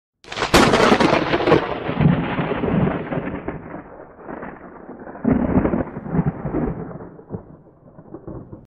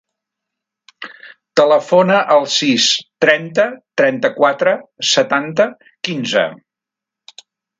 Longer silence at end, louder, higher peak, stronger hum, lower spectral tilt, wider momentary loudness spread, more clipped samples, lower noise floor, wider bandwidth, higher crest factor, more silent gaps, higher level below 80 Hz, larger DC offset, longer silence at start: second, 0.05 s vs 1.25 s; second, -19 LUFS vs -15 LUFS; about the same, -2 dBFS vs 0 dBFS; neither; first, -6 dB/octave vs -3 dB/octave; first, 22 LU vs 11 LU; neither; second, -46 dBFS vs -85 dBFS; first, 14.5 kHz vs 9.2 kHz; about the same, 18 dB vs 16 dB; neither; first, -38 dBFS vs -66 dBFS; neither; second, 0.3 s vs 1 s